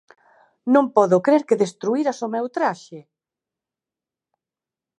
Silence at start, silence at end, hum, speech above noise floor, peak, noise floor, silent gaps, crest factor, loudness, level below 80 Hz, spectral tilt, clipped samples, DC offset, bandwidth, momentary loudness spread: 0.65 s; 2 s; none; 70 dB; -2 dBFS; -89 dBFS; none; 20 dB; -20 LUFS; -78 dBFS; -6.5 dB/octave; under 0.1%; under 0.1%; 11 kHz; 9 LU